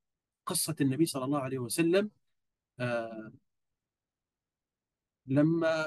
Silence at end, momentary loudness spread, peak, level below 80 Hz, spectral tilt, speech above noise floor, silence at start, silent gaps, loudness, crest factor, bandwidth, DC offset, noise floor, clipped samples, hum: 0 s; 13 LU; -14 dBFS; -78 dBFS; -5 dB/octave; over 60 dB; 0.45 s; none; -31 LUFS; 18 dB; 12.5 kHz; under 0.1%; under -90 dBFS; under 0.1%; none